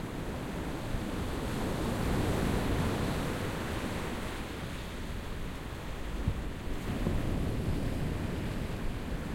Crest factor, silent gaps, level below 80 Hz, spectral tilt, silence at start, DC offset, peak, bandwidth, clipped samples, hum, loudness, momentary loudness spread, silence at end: 18 dB; none; -40 dBFS; -6 dB/octave; 0 s; under 0.1%; -16 dBFS; 16.5 kHz; under 0.1%; none; -35 LUFS; 9 LU; 0 s